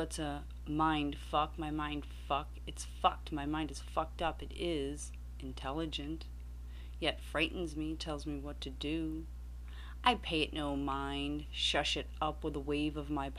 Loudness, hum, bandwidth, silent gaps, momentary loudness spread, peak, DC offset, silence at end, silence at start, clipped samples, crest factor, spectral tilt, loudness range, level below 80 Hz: -37 LUFS; 60 Hz at -45 dBFS; 14.5 kHz; none; 13 LU; -14 dBFS; under 0.1%; 0 s; 0 s; under 0.1%; 24 dB; -4.5 dB/octave; 4 LU; -46 dBFS